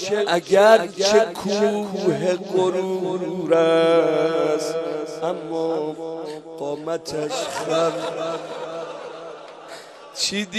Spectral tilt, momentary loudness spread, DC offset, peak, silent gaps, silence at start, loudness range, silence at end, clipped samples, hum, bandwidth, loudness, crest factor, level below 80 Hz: -4 dB/octave; 17 LU; under 0.1%; -2 dBFS; none; 0 s; 7 LU; 0 s; under 0.1%; none; 13.5 kHz; -21 LUFS; 20 dB; -66 dBFS